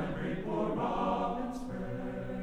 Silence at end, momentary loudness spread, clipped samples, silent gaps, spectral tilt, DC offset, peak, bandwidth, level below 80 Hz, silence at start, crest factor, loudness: 0 s; 7 LU; under 0.1%; none; -7.5 dB/octave; under 0.1%; -20 dBFS; 12.5 kHz; -48 dBFS; 0 s; 14 dB; -35 LUFS